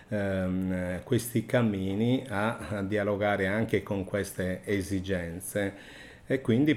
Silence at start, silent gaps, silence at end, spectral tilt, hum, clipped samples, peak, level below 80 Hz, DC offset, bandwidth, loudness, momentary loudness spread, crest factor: 0 s; none; 0 s; -6 dB/octave; none; under 0.1%; -12 dBFS; -56 dBFS; under 0.1%; 16 kHz; -30 LUFS; 6 LU; 18 dB